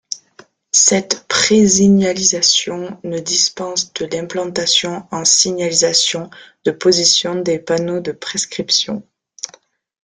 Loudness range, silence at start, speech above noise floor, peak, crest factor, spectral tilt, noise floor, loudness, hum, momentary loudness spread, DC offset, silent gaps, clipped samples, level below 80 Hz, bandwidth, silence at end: 3 LU; 0.1 s; 33 dB; 0 dBFS; 16 dB; -2.5 dB/octave; -49 dBFS; -14 LUFS; none; 14 LU; under 0.1%; none; under 0.1%; -56 dBFS; 10 kHz; 0.6 s